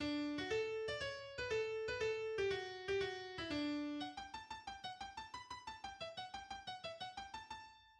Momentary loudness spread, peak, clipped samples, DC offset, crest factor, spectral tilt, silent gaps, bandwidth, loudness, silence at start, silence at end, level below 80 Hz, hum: 10 LU; -30 dBFS; under 0.1%; under 0.1%; 16 dB; -4 dB/octave; none; 10.5 kHz; -44 LUFS; 0 s; 0.05 s; -68 dBFS; none